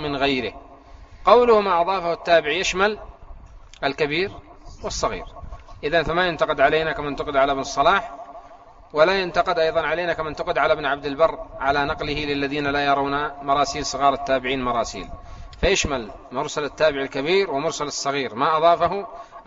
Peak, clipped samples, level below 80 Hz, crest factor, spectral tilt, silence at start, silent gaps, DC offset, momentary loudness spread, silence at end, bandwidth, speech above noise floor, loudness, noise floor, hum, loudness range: -2 dBFS; under 0.1%; -42 dBFS; 20 dB; -2.5 dB/octave; 0 s; none; under 0.1%; 12 LU; 0.05 s; 8 kHz; 24 dB; -21 LUFS; -46 dBFS; none; 4 LU